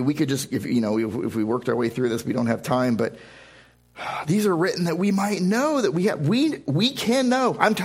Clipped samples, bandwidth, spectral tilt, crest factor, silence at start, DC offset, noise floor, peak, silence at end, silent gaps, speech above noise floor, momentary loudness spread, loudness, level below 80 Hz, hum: under 0.1%; 16 kHz; -5.5 dB/octave; 22 dB; 0 s; under 0.1%; -52 dBFS; 0 dBFS; 0 s; none; 30 dB; 5 LU; -23 LUFS; -60 dBFS; none